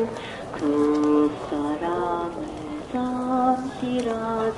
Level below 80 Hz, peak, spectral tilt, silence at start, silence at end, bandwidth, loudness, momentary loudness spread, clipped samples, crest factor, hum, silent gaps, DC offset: -52 dBFS; -10 dBFS; -6.5 dB/octave; 0 s; 0 s; 11.5 kHz; -25 LUFS; 12 LU; under 0.1%; 16 dB; none; none; under 0.1%